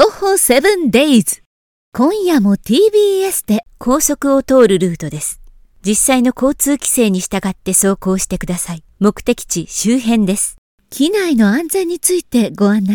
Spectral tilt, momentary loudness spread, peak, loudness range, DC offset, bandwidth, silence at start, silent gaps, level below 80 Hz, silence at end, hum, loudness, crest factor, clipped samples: -4 dB/octave; 9 LU; 0 dBFS; 3 LU; under 0.1%; 19.5 kHz; 0 s; 1.46-1.92 s, 10.58-10.78 s; -40 dBFS; 0 s; none; -14 LUFS; 14 dB; 0.1%